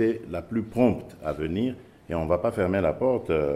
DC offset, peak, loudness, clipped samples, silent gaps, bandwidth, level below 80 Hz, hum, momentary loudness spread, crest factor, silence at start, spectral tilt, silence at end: under 0.1%; -8 dBFS; -27 LUFS; under 0.1%; none; 13.5 kHz; -50 dBFS; none; 9 LU; 18 dB; 0 s; -8.5 dB/octave; 0 s